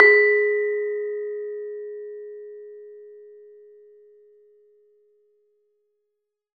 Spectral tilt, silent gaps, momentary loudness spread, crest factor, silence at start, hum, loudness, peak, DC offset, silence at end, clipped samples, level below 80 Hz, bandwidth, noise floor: -4 dB/octave; none; 27 LU; 26 dB; 0 s; none; -22 LUFS; 0 dBFS; under 0.1%; 3.35 s; under 0.1%; -74 dBFS; 4.8 kHz; -80 dBFS